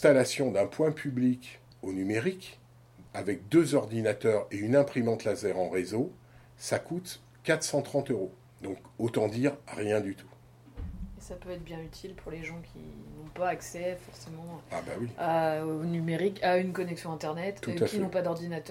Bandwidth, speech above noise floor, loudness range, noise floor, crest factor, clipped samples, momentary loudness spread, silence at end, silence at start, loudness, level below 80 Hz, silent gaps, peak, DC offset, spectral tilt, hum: 16.5 kHz; 25 dB; 10 LU; -55 dBFS; 22 dB; under 0.1%; 17 LU; 0 s; 0 s; -31 LUFS; -56 dBFS; none; -8 dBFS; under 0.1%; -5.5 dB/octave; none